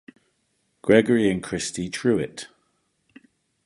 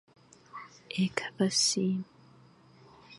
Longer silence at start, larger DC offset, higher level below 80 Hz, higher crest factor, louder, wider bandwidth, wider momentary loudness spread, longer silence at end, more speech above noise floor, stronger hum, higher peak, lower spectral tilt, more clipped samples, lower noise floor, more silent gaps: first, 0.85 s vs 0.55 s; neither; first, -56 dBFS vs -74 dBFS; about the same, 22 dB vs 20 dB; first, -22 LUFS vs -29 LUFS; about the same, 11.5 kHz vs 11.5 kHz; second, 16 LU vs 22 LU; first, 1.2 s vs 0 s; first, 49 dB vs 29 dB; neither; first, -4 dBFS vs -12 dBFS; first, -5 dB/octave vs -3.5 dB/octave; neither; first, -71 dBFS vs -58 dBFS; neither